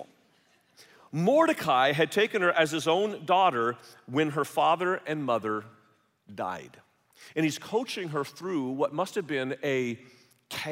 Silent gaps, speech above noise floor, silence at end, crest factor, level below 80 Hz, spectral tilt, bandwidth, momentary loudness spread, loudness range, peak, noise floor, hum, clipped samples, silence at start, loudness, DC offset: none; 38 dB; 0 s; 20 dB; -76 dBFS; -5 dB/octave; 16 kHz; 12 LU; 8 LU; -10 dBFS; -66 dBFS; none; under 0.1%; 0 s; -28 LUFS; under 0.1%